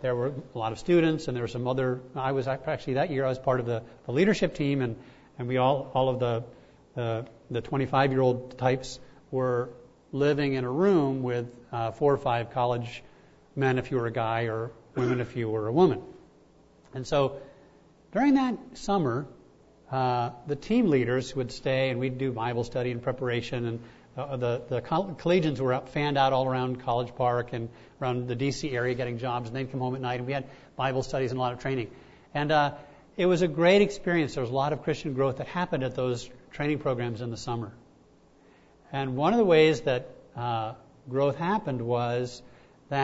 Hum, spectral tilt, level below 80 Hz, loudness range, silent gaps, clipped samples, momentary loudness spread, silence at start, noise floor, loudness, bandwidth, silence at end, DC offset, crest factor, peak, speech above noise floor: none; -6.5 dB/octave; -56 dBFS; 4 LU; none; under 0.1%; 12 LU; 0 s; -58 dBFS; -28 LUFS; 8 kHz; 0 s; under 0.1%; 20 dB; -8 dBFS; 31 dB